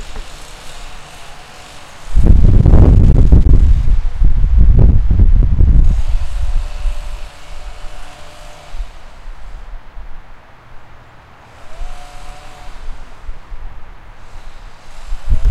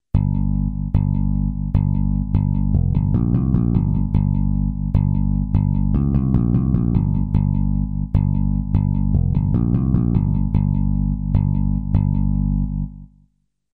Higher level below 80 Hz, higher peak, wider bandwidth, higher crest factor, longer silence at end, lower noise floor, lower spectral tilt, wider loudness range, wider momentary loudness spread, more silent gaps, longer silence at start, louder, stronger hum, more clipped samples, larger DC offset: first, -14 dBFS vs -24 dBFS; first, 0 dBFS vs -4 dBFS; first, 8.4 kHz vs 2.8 kHz; about the same, 12 dB vs 14 dB; second, 0 s vs 0.7 s; second, -39 dBFS vs -64 dBFS; second, -8 dB/octave vs -13 dB/octave; first, 25 LU vs 1 LU; first, 26 LU vs 3 LU; neither; second, 0 s vs 0.15 s; first, -13 LUFS vs -20 LUFS; second, none vs 50 Hz at -30 dBFS; first, 1% vs under 0.1%; neither